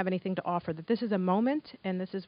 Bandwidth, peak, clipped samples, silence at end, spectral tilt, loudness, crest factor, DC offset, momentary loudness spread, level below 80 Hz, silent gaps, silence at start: 5.2 kHz; -14 dBFS; under 0.1%; 0 s; -6.5 dB/octave; -31 LUFS; 16 dB; under 0.1%; 7 LU; -72 dBFS; none; 0 s